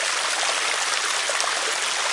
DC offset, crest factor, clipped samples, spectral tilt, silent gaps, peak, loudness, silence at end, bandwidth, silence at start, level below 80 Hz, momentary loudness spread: under 0.1%; 20 dB; under 0.1%; 2.5 dB/octave; none; -4 dBFS; -21 LUFS; 0 s; 11.5 kHz; 0 s; -72 dBFS; 1 LU